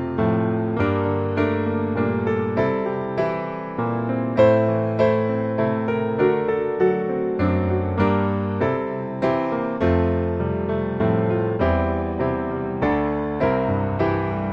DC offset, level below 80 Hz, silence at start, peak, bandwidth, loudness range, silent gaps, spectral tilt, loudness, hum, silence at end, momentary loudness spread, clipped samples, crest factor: under 0.1%; -42 dBFS; 0 s; -4 dBFS; 7 kHz; 2 LU; none; -10 dB/octave; -22 LUFS; none; 0 s; 5 LU; under 0.1%; 16 dB